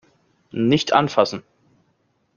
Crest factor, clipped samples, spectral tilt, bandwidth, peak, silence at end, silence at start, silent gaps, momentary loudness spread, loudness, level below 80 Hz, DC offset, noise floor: 22 dB; under 0.1%; -5.5 dB/octave; 7.2 kHz; -2 dBFS; 0.95 s; 0.55 s; none; 15 LU; -19 LUFS; -60 dBFS; under 0.1%; -66 dBFS